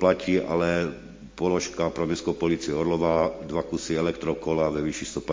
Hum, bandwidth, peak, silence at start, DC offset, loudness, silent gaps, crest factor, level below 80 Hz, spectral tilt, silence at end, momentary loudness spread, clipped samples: none; 7.6 kHz; -6 dBFS; 0 s; under 0.1%; -26 LUFS; none; 20 dB; -48 dBFS; -5.5 dB/octave; 0 s; 6 LU; under 0.1%